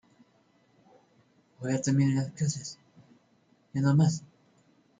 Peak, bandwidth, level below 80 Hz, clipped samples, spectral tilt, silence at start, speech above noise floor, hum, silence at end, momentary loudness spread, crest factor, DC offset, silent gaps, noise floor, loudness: -14 dBFS; 9.4 kHz; -68 dBFS; under 0.1%; -6.5 dB/octave; 1.6 s; 40 dB; none; 0.75 s; 15 LU; 16 dB; under 0.1%; none; -66 dBFS; -28 LUFS